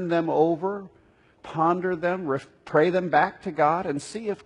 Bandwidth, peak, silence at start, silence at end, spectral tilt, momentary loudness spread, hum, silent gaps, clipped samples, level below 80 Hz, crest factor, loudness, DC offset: 11 kHz; -6 dBFS; 0 s; 0.1 s; -6.5 dB/octave; 9 LU; none; none; under 0.1%; -64 dBFS; 18 dB; -24 LUFS; under 0.1%